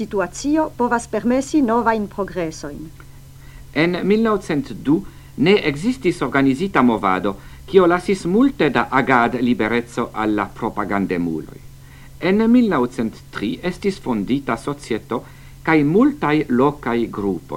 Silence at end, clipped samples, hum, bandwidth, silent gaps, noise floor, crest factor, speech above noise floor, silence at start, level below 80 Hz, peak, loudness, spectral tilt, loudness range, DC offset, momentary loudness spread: 0 s; under 0.1%; none; 16.5 kHz; none; -40 dBFS; 18 dB; 22 dB; 0 s; -44 dBFS; 0 dBFS; -19 LUFS; -6 dB/octave; 4 LU; under 0.1%; 11 LU